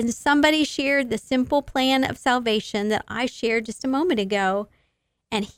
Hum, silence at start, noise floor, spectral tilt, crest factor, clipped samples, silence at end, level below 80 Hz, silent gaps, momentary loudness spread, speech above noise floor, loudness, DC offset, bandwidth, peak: none; 0 s; -72 dBFS; -4 dB/octave; 18 dB; under 0.1%; 0.1 s; -52 dBFS; none; 7 LU; 50 dB; -22 LUFS; under 0.1%; 16 kHz; -6 dBFS